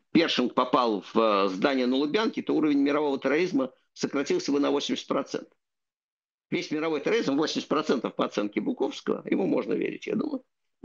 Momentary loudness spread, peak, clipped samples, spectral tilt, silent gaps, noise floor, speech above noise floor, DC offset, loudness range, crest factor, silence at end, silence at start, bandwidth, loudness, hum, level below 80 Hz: 7 LU; -8 dBFS; under 0.1%; -5 dB/octave; 6.04-6.17 s, 6.34-6.38 s; -88 dBFS; 62 dB; under 0.1%; 5 LU; 20 dB; 0.45 s; 0.15 s; 7.6 kHz; -27 LUFS; none; -76 dBFS